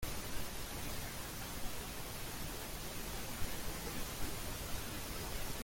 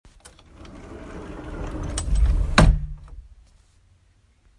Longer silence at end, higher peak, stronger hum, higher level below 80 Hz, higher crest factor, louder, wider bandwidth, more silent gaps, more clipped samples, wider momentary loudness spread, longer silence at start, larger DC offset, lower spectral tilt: second, 0 s vs 1.35 s; second, -24 dBFS vs 0 dBFS; neither; second, -48 dBFS vs -26 dBFS; second, 16 dB vs 24 dB; second, -43 LUFS vs -23 LUFS; first, 17 kHz vs 11.5 kHz; neither; neither; second, 2 LU vs 25 LU; second, 0 s vs 0.6 s; neither; second, -3 dB/octave vs -5.5 dB/octave